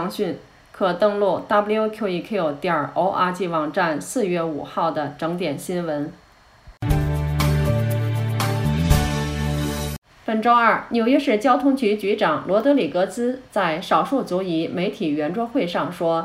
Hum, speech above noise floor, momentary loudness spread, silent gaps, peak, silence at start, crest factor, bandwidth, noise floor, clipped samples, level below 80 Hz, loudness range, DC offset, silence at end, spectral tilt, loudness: none; 27 dB; 8 LU; 9.98-10.02 s; -2 dBFS; 0 s; 18 dB; 16 kHz; -48 dBFS; under 0.1%; -36 dBFS; 5 LU; under 0.1%; 0 s; -6 dB/octave; -21 LUFS